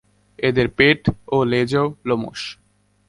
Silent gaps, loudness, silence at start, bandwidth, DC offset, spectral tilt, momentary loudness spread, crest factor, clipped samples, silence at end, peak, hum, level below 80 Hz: none; -19 LUFS; 0.4 s; 11.5 kHz; under 0.1%; -6.5 dB/octave; 12 LU; 20 dB; under 0.1%; 0.55 s; 0 dBFS; none; -44 dBFS